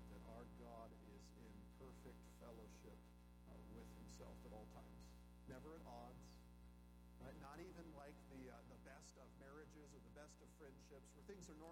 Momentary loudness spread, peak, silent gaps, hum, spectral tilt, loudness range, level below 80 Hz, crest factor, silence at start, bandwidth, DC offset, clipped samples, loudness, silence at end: 6 LU; -44 dBFS; none; 60 Hz at -65 dBFS; -5.5 dB/octave; 2 LU; -66 dBFS; 16 dB; 0 s; 18 kHz; under 0.1%; under 0.1%; -62 LUFS; 0 s